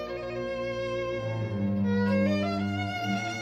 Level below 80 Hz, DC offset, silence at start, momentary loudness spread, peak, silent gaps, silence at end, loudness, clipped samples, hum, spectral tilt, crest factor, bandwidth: -56 dBFS; under 0.1%; 0 s; 7 LU; -16 dBFS; none; 0 s; -29 LUFS; under 0.1%; none; -6.5 dB/octave; 14 dB; 9 kHz